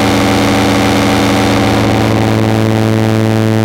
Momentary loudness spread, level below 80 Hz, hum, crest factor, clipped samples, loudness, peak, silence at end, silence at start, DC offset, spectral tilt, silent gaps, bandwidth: 1 LU; -30 dBFS; none; 10 dB; under 0.1%; -11 LUFS; 0 dBFS; 0 s; 0 s; under 0.1%; -5.5 dB/octave; none; 16.5 kHz